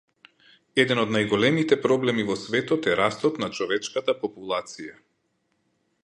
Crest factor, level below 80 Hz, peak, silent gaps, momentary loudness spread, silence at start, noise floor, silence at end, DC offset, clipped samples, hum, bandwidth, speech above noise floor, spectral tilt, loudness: 20 dB; -64 dBFS; -4 dBFS; none; 9 LU; 0.75 s; -72 dBFS; 1.1 s; under 0.1%; under 0.1%; none; 10.5 kHz; 48 dB; -5 dB/octave; -24 LUFS